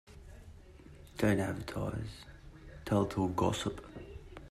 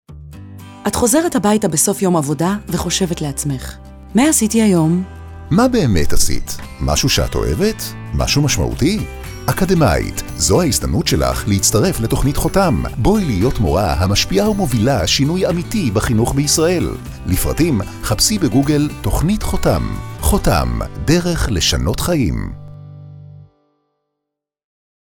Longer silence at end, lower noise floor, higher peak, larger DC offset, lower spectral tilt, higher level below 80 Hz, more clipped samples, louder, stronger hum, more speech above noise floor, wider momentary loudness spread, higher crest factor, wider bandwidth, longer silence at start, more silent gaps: second, 0 s vs 1.75 s; second, -54 dBFS vs -80 dBFS; second, -16 dBFS vs -4 dBFS; neither; first, -6 dB/octave vs -4.5 dB/octave; second, -54 dBFS vs -26 dBFS; neither; second, -34 LUFS vs -16 LUFS; second, none vs 50 Hz at -40 dBFS; second, 21 dB vs 65 dB; first, 24 LU vs 11 LU; first, 20 dB vs 12 dB; second, 15 kHz vs over 20 kHz; about the same, 0.1 s vs 0.1 s; neither